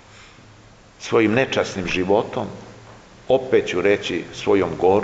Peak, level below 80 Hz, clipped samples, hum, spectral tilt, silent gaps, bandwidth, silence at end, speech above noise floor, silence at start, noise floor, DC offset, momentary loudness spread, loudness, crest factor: -4 dBFS; -50 dBFS; under 0.1%; none; -5.5 dB/octave; none; 8 kHz; 0 s; 28 dB; 0.15 s; -47 dBFS; under 0.1%; 11 LU; -20 LUFS; 18 dB